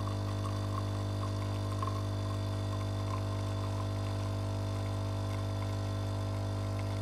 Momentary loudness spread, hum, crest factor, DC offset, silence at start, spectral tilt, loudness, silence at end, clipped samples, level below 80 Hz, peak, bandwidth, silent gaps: 1 LU; 50 Hz at -35 dBFS; 12 dB; under 0.1%; 0 s; -6.5 dB/octave; -36 LUFS; 0 s; under 0.1%; -48 dBFS; -22 dBFS; 13 kHz; none